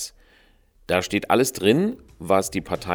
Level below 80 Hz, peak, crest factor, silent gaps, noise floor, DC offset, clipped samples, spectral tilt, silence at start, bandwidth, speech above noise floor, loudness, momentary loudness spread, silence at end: -52 dBFS; -4 dBFS; 20 dB; none; -57 dBFS; under 0.1%; under 0.1%; -4.5 dB/octave; 0 s; over 20 kHz; 35 dB; -22 LUFS; 9 LU; 0 s